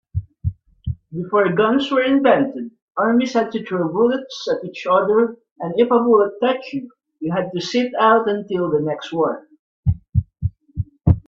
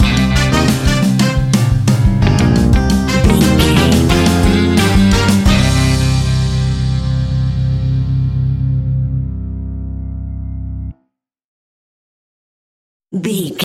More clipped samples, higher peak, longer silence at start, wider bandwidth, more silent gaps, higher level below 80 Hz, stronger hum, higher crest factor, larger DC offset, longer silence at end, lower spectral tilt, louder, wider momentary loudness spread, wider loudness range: neither; about the same, -2 dBFS vs 0 dBFS; first, 0.15 s vs 0 s; second, 7.4 kHz vs 16 kHz; second, 2.82-2.88 s, 5.51-5.56 s, 9.59-9.83 s vs 11.44-13.00 s; second, -40 dBFS vs -20 dBFS; neither; about the same, 18 dB vs 14 dB; neither; about the same, 0.1 s vs 0 s; about the same, -7 dB/octave vs -6 dB/octave; second, -19 LUFS vs -13 LUFS; about the same, 15 LU vs 14 LU; second, 2 LU vs 16 LU